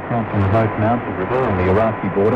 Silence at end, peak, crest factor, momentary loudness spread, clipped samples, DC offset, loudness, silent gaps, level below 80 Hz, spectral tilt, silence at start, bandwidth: 0 s; -6 dBFS; 12 dB; 4 LU; under 0.1%; under 0.1%; -18 LUFS; none; -40 dBFS; -9.5 dB/octave; 0 s; 5.4 kHz